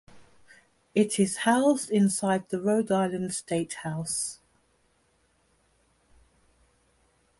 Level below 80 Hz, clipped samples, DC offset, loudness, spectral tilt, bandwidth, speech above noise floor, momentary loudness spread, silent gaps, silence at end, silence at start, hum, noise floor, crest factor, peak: -68 dBFS; under 0.1%; under 0.1%; -27 LUFS; -4.5 dB/octave; 11.5 kHz; 42 dB; 9 LU; none; 3.05 s; 0.15 s; none; -68 dBFS; 20 dB; -10 dBFS